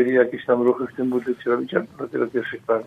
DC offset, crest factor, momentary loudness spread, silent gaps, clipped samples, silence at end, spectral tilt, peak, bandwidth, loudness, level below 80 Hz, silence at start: under 0.1%; 18 dB; 6 LU; none; under 0.1%; 0 s; -7.5 dB/octave; -4 dBFS; 4.8 kHz; -23 LUFS; -66 dBFS; 0 s